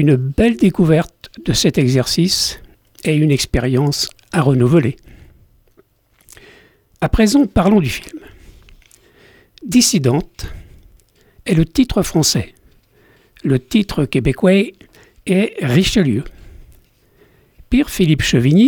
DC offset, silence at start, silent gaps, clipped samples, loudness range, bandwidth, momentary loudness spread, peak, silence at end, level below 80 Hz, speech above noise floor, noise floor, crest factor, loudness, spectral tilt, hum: under 0.1%; 0 s; none; under 0.1%; 4 LU; over 20 kHz; 14 LU; -2 dBFS; 0 s; -34 dBFS; 40 dB; -54 dBFS; 14 dB; -15 LUFS; -5.5 dB/octave; none